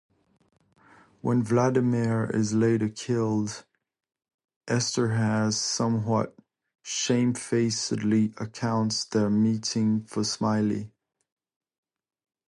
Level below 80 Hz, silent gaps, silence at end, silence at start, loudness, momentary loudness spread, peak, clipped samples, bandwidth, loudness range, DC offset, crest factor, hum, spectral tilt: -62 dBFS; 4.34-4.39 s, 4.56-4.61 s; 1.65 s; 1.25 s; -26 LUFS; 6 LU; -10 dBFS; under 0.1%; 11.5 kHz; 2 LU; under 0.1%; 18 dB; none; -5 dB/octave